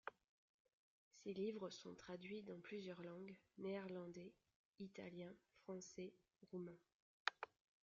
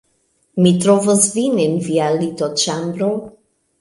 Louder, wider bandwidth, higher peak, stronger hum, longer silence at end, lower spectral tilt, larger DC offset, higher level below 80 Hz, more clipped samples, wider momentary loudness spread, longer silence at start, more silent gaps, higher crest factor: second, -54 LUFS vs -16 LUFS; second, 7.4 kHz vs 11.5 kHz; second, -20 dBFS vs 0 dBFS; neither; second, 0.35 s vs 0.5 s; about the same, -4 dB/octave vs -5 dB/octave; neither; second, -90 dBFS vs -60 dBFS; neither; first, 11 LU vs 8 LU; second, 0.05 s vs 0.55 s; first, 0.29-0.65 s, 0.73-1.11 s, 4.56-4.73 s, 6.94-7.26 s vs none; first, 36 dB vs 16 dB